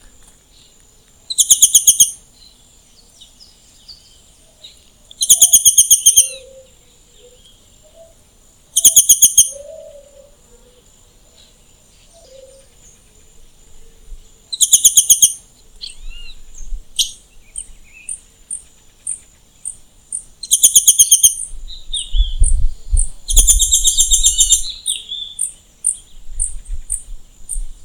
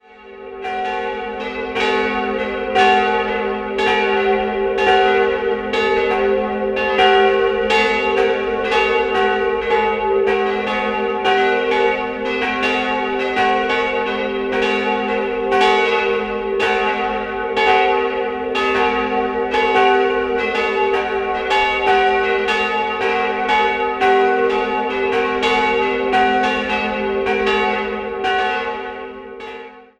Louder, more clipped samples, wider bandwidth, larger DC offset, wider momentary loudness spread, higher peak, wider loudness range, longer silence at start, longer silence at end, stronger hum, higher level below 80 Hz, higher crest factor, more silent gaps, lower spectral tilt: first, -10 LUFS vs -17 LUFS; first, 0.5% vs under 0.1%; first, over 20 kHz vs 9.8 kHz; neither; first, 22 LU vs 7 LU; about the same, 0 dBFS vs 0 dBFS; first, 14 LU vs 2 LU; first, 1.3 s vs 0.1 s; second, 0 s vs 0.15 s; neither; first, -26 dBFS vs -44 dBFS; about the same, 16 dB vs 16 dB; neither; second, 1 dB/octave vs -4 dB/octave